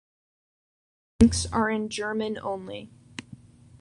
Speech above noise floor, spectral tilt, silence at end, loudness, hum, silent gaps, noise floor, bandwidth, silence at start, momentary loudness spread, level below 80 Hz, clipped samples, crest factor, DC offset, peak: 20 dB; -5 dB/octave; 0.45 s; -25 LUFS; none; none; -49 dBFS; 11 kHz; 1.2 s; 21 LU; -42 dBFS; under 0.1%; 24 dB; under 0.1%; -4 dBFS